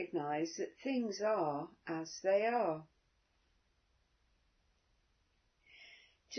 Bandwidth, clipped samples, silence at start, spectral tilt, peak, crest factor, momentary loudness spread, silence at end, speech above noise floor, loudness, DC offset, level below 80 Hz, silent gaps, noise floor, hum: 6.4 kHz; under 0.1%; 0 s; -4 dB/octave; -22 dBFS; 18 dB; 11 LU; 0 s; 40 dB; -37 LUFS; under 0.1%; -80 dBFS; none; -77 dBFS; none